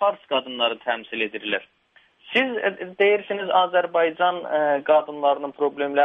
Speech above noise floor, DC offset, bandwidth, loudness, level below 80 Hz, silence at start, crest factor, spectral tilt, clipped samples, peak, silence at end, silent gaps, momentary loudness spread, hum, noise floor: 36 dB; under 0.1%; 5.2 kHz; -22 LUFS; -74 dBFS; 0 s; 16 dB; -6 dB/octave; under 0.1%; -6 dBFS; 0 s; none; 7 LU; none; -58 dBFS